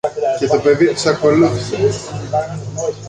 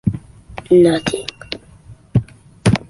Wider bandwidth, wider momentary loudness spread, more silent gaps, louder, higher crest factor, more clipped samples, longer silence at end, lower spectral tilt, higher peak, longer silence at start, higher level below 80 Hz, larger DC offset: second, 10 kHz vs 11.5 kHz; second, 10 LU vs 20 LU; neither; about the same, -16 LUFS vs -17 LUFS; about the same, 14 dB vs 16 dB; neither; about the same, 0 s vs 0.1 s; about the same, -5.5 dB/octave vs -6.5 dB/octave; about the same, -2 dBFS vs -2 dBFS; about the same, 0.05 s vs 0.05 s; second, -46 dBFS vs -40 dBFS; neither